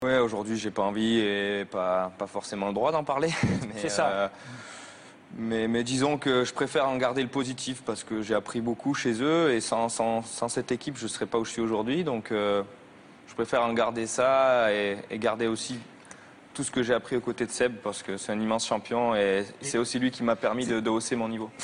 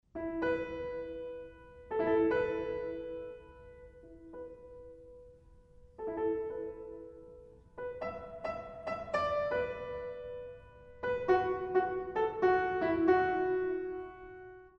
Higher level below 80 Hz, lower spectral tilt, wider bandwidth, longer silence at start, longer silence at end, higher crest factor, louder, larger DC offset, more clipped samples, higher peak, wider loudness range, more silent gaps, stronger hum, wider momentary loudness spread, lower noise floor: about the same, -62 dBFS vs -60 dBFS; second, -4.5 dB/octave vs -7.5 dB/octave; first, 11 kHz vs 6.6 kHz; second, 0 s vs 0.15 s; about the same, 0 s vs 0.1 s; about the same, 18 dB vs 20 dB; first, -28 LUFS vs -34 LUFS; neither; neither; first, -10 dBFS vs -14 dBFS; second, 3 LU vs 11 LU; neither; neither; second, 9 LU vs 23 LU; second, -50 dBFS vs -59 dBFS